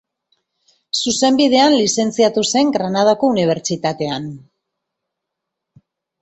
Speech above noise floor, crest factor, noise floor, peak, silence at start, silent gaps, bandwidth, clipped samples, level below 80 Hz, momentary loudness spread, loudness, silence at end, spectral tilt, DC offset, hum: 64 dB; 16 dB; -80 dBFS; -2 dBFS; 0.95 s; none; 8.2 kHz; under 0.1%; -60 dBFS; 10 LU; -16 LUFS; 1.85 s; -4 dB/octave; under 0.1%; none